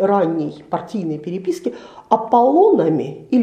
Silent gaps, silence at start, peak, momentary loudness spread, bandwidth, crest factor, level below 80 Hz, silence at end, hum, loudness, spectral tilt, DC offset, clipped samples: none; 0 s; 0 dBFS; 13 LU; 10 kHz; 16 dB; -64 dBFS; 0 s; none; -18 LUFS; -8 dB/octave; under 0.1%; under 0.1%